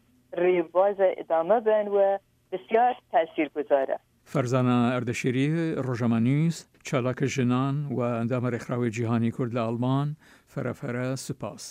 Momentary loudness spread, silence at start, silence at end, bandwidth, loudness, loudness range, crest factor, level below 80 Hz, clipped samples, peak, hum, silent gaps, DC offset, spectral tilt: 10 LU; 0.3 s; 0 s; 15.5 kHz; -26 LUFS; 4 LU; 16 dB; -68 dBFS; under 0.1%; -10 dBFS; none; none; under 0.1%; -7 dB/octave